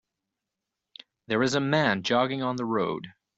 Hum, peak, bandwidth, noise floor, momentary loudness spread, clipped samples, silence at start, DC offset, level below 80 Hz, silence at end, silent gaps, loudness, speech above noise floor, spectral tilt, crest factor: none; -8 dBFS; 8.2 kHz; -86 dBFS; 7 LU; under 0.1%; 1.3 s; under 0.1%; -66 dBFS; 0.3 s; none; -26 LUFS; 60 dB; -5 dB/octave; 20 dB